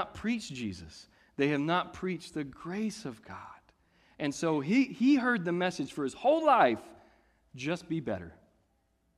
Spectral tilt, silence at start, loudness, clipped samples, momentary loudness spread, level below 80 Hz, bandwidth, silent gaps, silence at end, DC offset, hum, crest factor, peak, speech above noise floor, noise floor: -5.5 dB/octave; 0 s; -31 LUFS; under 0.1%; 20 LU; -64 dBFS; 12 kHz; none; 0.85 s; under 0.1%; none; 20 dB; -12 dBFS; 43 dB; -73 dBFS